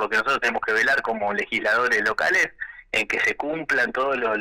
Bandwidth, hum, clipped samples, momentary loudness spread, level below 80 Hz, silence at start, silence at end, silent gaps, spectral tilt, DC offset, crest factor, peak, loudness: 16.5 kHz; none; under 0.1%; 5 LU; -56 dBFS; 0 s; 0 s; none; -2.5 dB/octave; under 0.1%; 10 dB; -14 dBFS; -22 LUFS